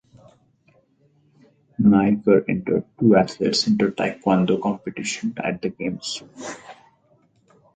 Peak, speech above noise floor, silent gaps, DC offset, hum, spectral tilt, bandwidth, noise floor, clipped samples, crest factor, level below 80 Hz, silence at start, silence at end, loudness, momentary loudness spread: -2 dBFS; 40 dB; none; under 0.1%; none; -5.5 dB/octave; 9.2 kHz; -61 dBFS; under 0.1%; 20 dB; -56 dBFS; 1.8 s; 1 s; -21 LUFS; 14 LU